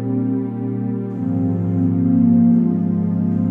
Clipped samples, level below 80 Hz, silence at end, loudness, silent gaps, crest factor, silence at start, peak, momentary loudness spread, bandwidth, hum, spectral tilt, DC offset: under 0.1%; -64 dBFS; 0 s; -18 LUFS; none; 12 dB; 0 s; -6 dBFS; 9 LU; 2.5 kHz; none; -13 dB/octave; under 0.1%